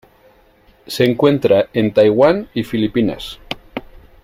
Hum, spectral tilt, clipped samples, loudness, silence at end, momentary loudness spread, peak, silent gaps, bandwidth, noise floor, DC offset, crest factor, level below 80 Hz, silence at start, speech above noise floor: none; -6.5 dB/octave; under 0.1%; -15 LUFS; 0.45 s; 17 LU; -2 dBFS; none; 16 kHz; -51 dBFS; under 0.1%; 16 dB; -46 dBFS; 0.9 s; 36 dB